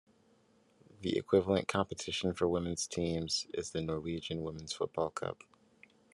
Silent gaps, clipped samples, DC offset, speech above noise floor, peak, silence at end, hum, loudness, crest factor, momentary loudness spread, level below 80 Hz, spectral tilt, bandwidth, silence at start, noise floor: none; under 0.1%; under 0.1%; 34 dB; -14 dBFS; 0.8 s; none; -35 LUFS; 22 dB; 10 LU; -66 dBFS; -4.5 dB/octave; 12.5 kHz; 1 s; -68 dBFS